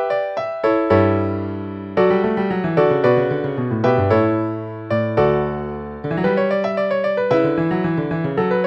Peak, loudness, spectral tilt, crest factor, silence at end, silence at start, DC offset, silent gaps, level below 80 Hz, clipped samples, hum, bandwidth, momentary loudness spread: -2 dBFS; -19 LUFS; -9 dB/octave; 16 dB; 0 s; 0 s; under 0.1%; none; -46 dBFS; under 0.1%; none; 7.4 kHz; 9 LU